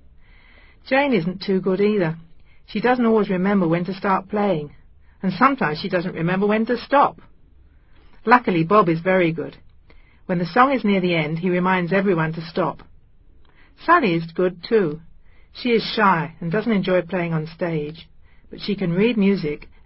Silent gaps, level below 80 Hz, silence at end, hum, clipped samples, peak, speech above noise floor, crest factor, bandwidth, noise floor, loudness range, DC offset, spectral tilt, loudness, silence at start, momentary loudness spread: none; -52 dBFS; 0.2 s; none; under 0.1%; 0 dBFS; 30 dB; 20 dB; 5.8 kHz; -50 dBFS; 3 LU; under 0.1%; -10.5 dB/octave; -20 LUFS; 0.85 s; 11 LU